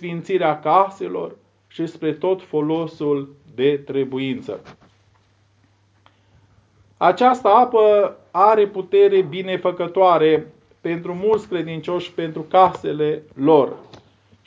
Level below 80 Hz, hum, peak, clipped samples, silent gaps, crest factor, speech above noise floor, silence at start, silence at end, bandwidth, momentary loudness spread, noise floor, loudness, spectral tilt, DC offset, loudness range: -64 dBFS; none; 0 dBFS; under 0.1%; none; 20 dB; 40 dB; 0 s; 0.65 s; 7.8 kHz; 13 LU; -59 dBFS; -19 LUFS; -7.5 dB/octave; under 0.1%; 10 LU